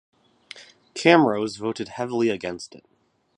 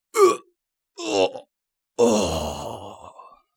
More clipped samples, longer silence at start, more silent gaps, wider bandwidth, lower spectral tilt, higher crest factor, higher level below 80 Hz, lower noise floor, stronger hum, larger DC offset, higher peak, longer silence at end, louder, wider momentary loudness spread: neither; first, 0.55 s vs 0.15 s; neither; second, 10.5 kHz vs 18 kHz; about the same, -5 dB/octave vs -4 dB/octave; about the same, 24 dB vs 20 dB; second, -66 dBFS vs -48 dBFS; second, -47 dBFS vs -77 dBFS; neither; neither; first, 0 dBFS vs -4 dBFS; first, 0.7 s vs 0.35 s; about the same, -22 LUFS vs -22 LUFS; first, 26 LU vs 21 LU